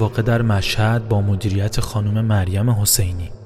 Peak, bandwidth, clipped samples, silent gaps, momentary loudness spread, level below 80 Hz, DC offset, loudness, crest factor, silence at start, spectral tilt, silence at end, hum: 0 dBFS; 15.5 kHz; under 0.1%; none; 5 LU; -34 dBFS; under 0.1%; -18 LUFS; 18 dB; 0 s; -5 dB/octave; 0 s; none